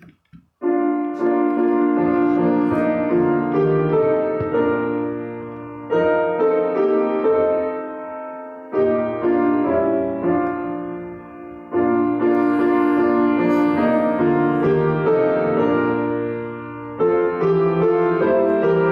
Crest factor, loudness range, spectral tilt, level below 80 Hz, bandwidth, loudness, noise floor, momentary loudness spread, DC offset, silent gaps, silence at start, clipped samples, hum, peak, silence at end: 14 dB; 3 LU; -10 dB/octave; -54 dBFS; 5.2 kHz; -19 LUFS; -50 dBFS; 12 LU; under 0.1%; none; 0.35 s; under 0.1%; none; -6 dBFS; 0 s